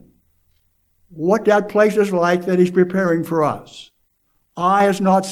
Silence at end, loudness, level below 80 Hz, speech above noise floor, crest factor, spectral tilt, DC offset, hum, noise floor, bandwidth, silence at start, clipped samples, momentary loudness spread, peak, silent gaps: 0 s; -17 LUFS; -62 dBFS; 49 dB; 16 dB; -6.5 dB/octave; under 0.1%; none; -65 dBFS; 14.5 kHz; 1.1 s; under 0.1%; 7 LU; -2 dBFS; none